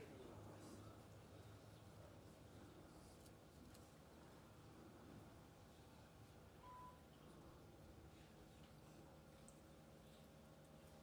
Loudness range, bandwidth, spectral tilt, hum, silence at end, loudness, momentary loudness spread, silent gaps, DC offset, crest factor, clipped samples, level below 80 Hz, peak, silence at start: 2 LU; 18 kHz; -5.5 dB/octave; none; 0 s; -64 LUFS; 5 LU; none; under 0.1%; 18 dB; under 0.1%; -74 dBFS; -46 dBFS; 0 s